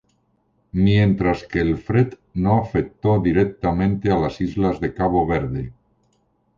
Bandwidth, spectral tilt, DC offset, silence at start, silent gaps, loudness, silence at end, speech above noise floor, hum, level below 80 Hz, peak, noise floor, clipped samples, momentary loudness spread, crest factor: 7.2 kHz; -9 dB/octave; under 0.1%; 0.75 s; none; -20 LUFS; 0.85 s; 46 dB; none; -38 dBFS; -6 dBFS; -65 dBFS; under 0.1%; 6 LU; 16 dB